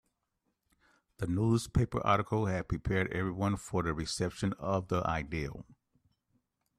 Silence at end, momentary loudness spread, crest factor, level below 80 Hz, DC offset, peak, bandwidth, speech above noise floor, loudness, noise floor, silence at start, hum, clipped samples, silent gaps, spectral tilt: 1.05 s; 7 LU; 20 dB; -50 dBFS; under 0.1%; -14 dBFS; 14 kHz; 50 dB; -33 LUFS; -82 dBFS; 1.2 s; none; under 0.1%; none; -6 dB/octave